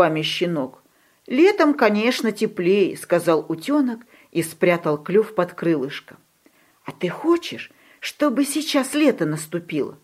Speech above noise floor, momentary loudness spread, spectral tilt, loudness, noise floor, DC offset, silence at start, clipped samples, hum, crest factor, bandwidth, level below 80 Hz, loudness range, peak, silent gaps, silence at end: 38 dB; 15 LU; -5 dB/octave; -21 LUFS; -58 dBFS; under 0.1%; 0 s; under 0.1%; none; 20 dB; 16 kHz; -72 dBFS; 5 LU; -2 dBFS; none; 0.1 s